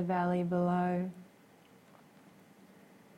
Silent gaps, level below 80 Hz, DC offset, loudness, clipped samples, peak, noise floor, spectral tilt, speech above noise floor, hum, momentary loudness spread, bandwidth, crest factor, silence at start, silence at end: none; -72 dBFS; under 0.1%; -32 LUFS; under 0.1%; -20 dBFS; -61 dBFS; -9 dB/octave; 29 dB; none; 11 LU; 9.2 kHz; 16 dB; 0 s; 1.95 s